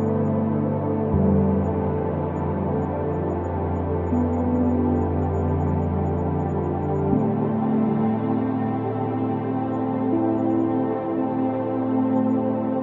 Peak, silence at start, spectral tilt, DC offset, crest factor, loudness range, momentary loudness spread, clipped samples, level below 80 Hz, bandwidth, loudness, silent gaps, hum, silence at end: -6 dBFS; 0 s; -11.5 dB/octave; under 0.1%; 16 dB; 1 LU; 4 LU; under 0.1%; -46 dBFS; 3.9 kHz; -23 LUFS; none; none; 0 s